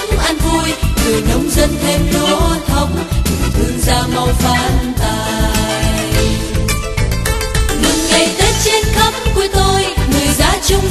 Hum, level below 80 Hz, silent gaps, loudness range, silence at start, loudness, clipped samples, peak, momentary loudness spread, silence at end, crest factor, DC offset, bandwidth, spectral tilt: none; -18 dBFS; none; 3 LU; 0 s; -14 LUFS; under 0.1%; 0 dBFS; 5 LU; 0 s; 12 dB; under 0.1%; 13.5 kHz; -4 dB/octave